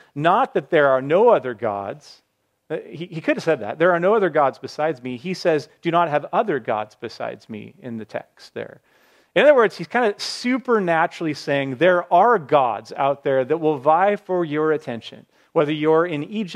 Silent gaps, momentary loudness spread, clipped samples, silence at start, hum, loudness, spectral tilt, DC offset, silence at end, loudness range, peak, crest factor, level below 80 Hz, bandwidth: none; 17 LU; under 0.1%; 0.15 s; none; -20 LUFS; -6 dB/octave; under 0.1%; 0 s; 5 LU; -2 dBFS; 18 dB; -74 dBFS; 11.5 kHz